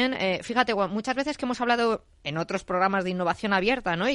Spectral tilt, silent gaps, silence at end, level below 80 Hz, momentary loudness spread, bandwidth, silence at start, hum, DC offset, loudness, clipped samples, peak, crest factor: -5 dB/octave; none; 0 s; -54 dBFS; 6 LU; 11.5 kHz; 0 s; none; under 0.1%; -26 LUFS; under 0.1%; -6 dBFS; 20 dB